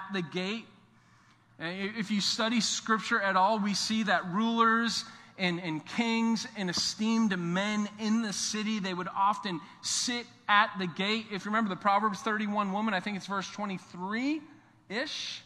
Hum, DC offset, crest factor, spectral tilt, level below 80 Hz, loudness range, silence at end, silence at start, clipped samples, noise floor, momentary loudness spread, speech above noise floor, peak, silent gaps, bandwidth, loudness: none; under 0.1%; 22 dB; -3.5 dB/octave; -76 dBFS; 3 LU; 0.05 s; 0 s; under 0.1%; -62 dBFS; 10 LU; 31 dB; -8 dBFS; none; 13 kHz; -30 LUFS